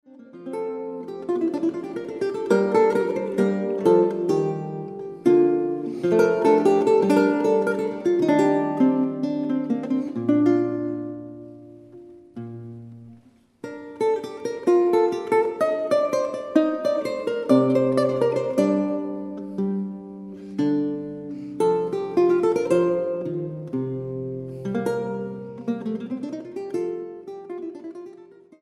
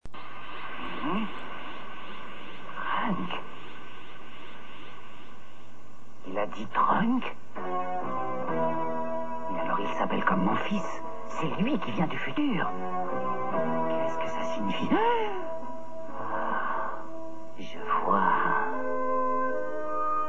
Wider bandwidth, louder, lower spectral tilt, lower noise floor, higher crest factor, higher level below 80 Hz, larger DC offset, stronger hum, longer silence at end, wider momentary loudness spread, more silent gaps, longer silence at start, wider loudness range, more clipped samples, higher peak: first, 12 kHz vs 9.4 kHz; first, -23 LUFS vs -30 LUFS; about the same, -7.5 dB/octave vs -6.5 dB/octave; about the same, -53 dBFS vs -53 dBFS; about the same, 18 dB vs 20 dB; about the same, -68 dBFS vs -64 dBFS; second, under 0.1% vs 3%; neither; first, 0.4 s vs 0 s; about the same, 17 LU vs 18 LU; neither; first, 0.2 s vs 0 s; about the same, 10 LU vs 8 LU; neither; first, -6 dBFS vs -10 dBFS